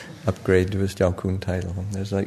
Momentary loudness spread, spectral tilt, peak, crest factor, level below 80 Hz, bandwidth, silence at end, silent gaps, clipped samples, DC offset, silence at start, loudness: 8 LU; -7 dB/octave; -4 dBFS; 20 dB; -46 dBFS; 13 kHz; 0 s; none; under 0.1%; under 0.1%; 0 s; -24 LUFS